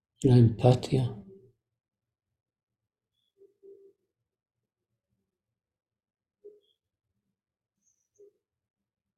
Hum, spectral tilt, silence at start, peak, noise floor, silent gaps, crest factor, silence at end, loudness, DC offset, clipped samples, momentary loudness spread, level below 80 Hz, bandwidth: none; -8.5 dB/octave; 0.2 s; -8 dBFS; -89 dBFS; none; 24 dB; 7.95 s; -24 LUFS; under 0.1%; under 0.1%; 14 LU; -58 dBFS; 9.6 kHz